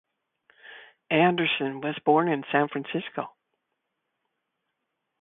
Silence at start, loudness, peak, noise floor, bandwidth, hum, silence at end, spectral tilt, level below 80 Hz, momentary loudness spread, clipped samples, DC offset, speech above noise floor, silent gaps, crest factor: 0.65 s; -25 LUFS; -8 dBFS; -81 dBFS; 4 kHz; none; 1.95 s; -10 dB/octave; -72 dBFS; 15 LU; under 0.1%; under 0.1%; 56 dB; none; 22 dB